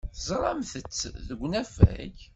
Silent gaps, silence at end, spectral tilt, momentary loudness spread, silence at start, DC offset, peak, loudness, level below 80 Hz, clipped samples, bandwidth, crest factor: none; 0.1 s; -5.5 dB/octave; 12 LU; 0.05 s; under 0.1%; -2 dBFS; -28 LUFS; -36 dBFS; under 0.1%; 8.2 kHz; 26 dB